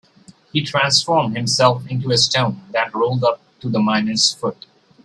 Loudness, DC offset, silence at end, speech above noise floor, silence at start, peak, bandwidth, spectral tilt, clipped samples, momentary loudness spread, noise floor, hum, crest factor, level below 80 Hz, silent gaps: -18 LUFS; under 0.1%; 0.5 s; 31 dB; 0.55 s; 0 dBFS; 12.5 kHz; -3.5 dB/octave; under 0.1%; 9 LU; -49 dBFS; none; 18 dB; -58 dBFS; none